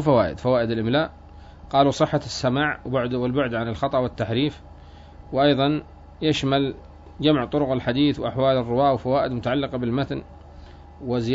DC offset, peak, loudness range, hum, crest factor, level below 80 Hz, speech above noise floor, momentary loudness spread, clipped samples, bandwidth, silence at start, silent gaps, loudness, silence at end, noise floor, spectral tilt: under 0.1%; -4 dBFS; 2 LU; none; 18 dB; -46 dBFS; 22 dB; 7 LU; under 0.1%; 7.8 kHz; 0 s; none; -23 LUFS; 0 s; -44 dBFS; -6.5 dB/octave